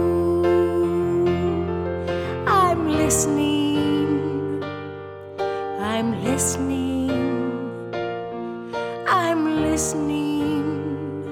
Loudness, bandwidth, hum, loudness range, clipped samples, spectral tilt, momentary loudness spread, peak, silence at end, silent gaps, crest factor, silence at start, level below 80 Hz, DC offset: -22 LUFS; 16.5 kHz; none; 4 LU; under 0.1%; -5 dB/octave; 10 LU; -6 dBFS; 0 s; none; 16 dB; 0 s; -44 dBFS; under 0.1%